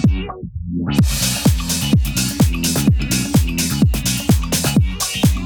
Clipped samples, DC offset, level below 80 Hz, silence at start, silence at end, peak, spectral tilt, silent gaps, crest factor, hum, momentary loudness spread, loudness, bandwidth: under 0.1%; under 0.1%; -24 dBFS; 0 s; 0 s; -2 dBFS; -4.5 dB/octave; none; 14 dB; none; 4 LU; -17 LUFS; over 20 kHz